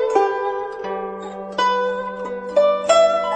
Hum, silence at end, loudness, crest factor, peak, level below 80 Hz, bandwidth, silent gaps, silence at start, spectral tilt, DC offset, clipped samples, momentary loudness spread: none; 0 s; -20 LUFS; 16 dB; -2 dBFS; -58 dBFS; 9.4 kHz; none; 0 s; -3 dB/octave; under 0.1%; under 0.1%; 13 LU